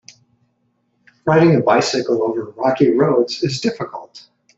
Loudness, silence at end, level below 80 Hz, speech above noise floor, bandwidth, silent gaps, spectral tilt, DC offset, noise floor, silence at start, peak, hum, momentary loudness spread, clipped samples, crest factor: -16 LUFS; 0.4 s; -58 dBFS; 49 dB; 8 kHz; none; -6 dB/octave; under 0.1%; -66 dBFS; 1.25 s; 0 dBFS; none; 13 LU; under 0.1%; 18 dB